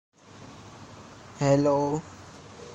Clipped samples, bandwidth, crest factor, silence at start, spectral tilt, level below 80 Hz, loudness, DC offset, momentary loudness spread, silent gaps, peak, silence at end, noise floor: under 0.1%; 8.6 kHz; 20 dB; 0.4 s; -6.5 dB/octave; -60 dBFS; -25 LUFS; under 0.1%; 24 LU; none; -8 dBFS; 0 s; -48 dBFS